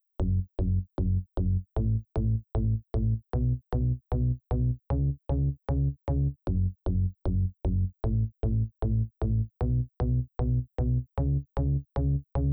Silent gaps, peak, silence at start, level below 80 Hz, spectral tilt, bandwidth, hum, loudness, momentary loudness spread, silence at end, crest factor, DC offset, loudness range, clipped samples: none; -18 dBFS; 0.2 s; -32 dBFS; -12 dB/octave; 4 kHz; none; -30 LUFS; 1 LU; 0 s; 10 dB; under 0.1%; 0 LU; under 0.1%